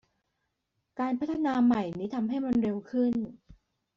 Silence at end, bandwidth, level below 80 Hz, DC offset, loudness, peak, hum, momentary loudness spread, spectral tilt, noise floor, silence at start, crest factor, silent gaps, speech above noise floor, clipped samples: 0.4 s; 7 kHz; -62 dBFS; under 0.1%; -29 LUFS; -16 dBFS; none; 9 LU; -6.5 dB/octave; -81 dBFS; 0.95 s; 14 dB; none; 52 dB; under 0.1%